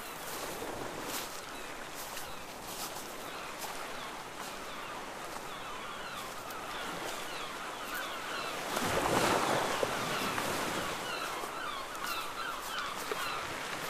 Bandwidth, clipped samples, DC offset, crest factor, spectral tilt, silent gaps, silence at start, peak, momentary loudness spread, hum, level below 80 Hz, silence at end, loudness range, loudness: 15.5 kHz; under 0.1%; under 0.1%; 22 dB; -2.5 dB/octave; none; 0 s; -16 dBFS; 10 LU; none; -58 dBFS; 0 s; 9 LU; -37 LUFS